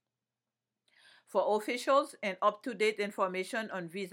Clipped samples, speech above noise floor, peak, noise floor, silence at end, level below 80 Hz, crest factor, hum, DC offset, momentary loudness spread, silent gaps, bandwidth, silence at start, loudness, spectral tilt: under 0.1%; over 58 dB; -14 dBFS; under -90 dBFS; 0 s; under -90 dBFS; 20 dB; none; under 0.1%; 8 LU; none; 17 kHz; 1.35 s; -32 LUFS; -4 dB/octave